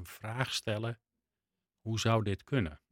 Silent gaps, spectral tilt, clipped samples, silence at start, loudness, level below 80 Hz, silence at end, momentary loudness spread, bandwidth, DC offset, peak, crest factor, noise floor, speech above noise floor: none; -5 dB/octave; under 0.1%; 0 s; -34 LUFS; -60 dBFS; 0.15 s; 11 LU; 16.5 kHz; under 0.1%; -12 dBFS; 24 dB; under -90 dBFS; over 56 dB